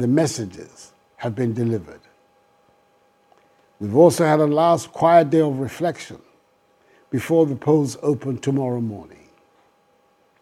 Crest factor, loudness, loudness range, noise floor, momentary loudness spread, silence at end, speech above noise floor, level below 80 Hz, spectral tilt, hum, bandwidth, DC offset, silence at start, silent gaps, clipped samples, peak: 20 dB; -20 LUFS; 9 LU; -60 dBFS; 16 LU; 1.35 s; 41 dB; -64 dBFS; -6.5 dB/octave; none; 15 kHz; under 0.1%; 0 s; none; under 0.1%; 0 dBFS